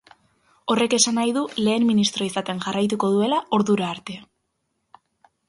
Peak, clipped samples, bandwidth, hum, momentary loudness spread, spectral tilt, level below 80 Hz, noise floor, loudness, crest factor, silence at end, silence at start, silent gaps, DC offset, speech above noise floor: -4 dBFS; under 0.1%; 11.5 kHz; none; 11 LU; -4 dB/octave; -66 dBFS; -74 dBFS; -21 LUFS; 20 dB; 1.25 s; 0.65 s; none; under 0.1%; 53 dB